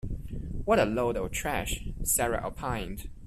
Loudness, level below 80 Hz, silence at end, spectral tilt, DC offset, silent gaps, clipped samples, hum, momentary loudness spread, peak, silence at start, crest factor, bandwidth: -30 LUFS; -40 dBFS; 0 s; -4 dB/octave; under 0.1%; none; under 0.1%; none; 13 LU; -12 dBFS; 0.05 s; 18 dB; 15.5 kHz